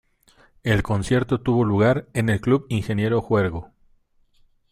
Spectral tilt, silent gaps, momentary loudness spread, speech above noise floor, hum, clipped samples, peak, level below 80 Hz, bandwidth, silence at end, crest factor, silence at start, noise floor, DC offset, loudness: -7 dB/octave; none; 6 LU; 39 dB; none; under 0.1%; -6 dBFS; -44 dBFS; 13.5 kHz; 1.05 s; 16 dB; 0.65 s; -60 dBFS; under 0.1%; -22 LUFS